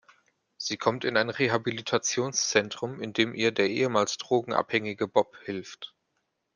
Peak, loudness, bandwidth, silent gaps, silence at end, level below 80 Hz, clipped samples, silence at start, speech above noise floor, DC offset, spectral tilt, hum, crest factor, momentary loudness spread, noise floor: -4 dBFS; -27 LUFS; 10.5 kHz; none; 0.7 s; -72 dBFS; under 0.1%; 0.6 s; 50 dB; under 0.1%; -3.5 dB/octave; none; 24 dB; 11 LU; -78 dBFS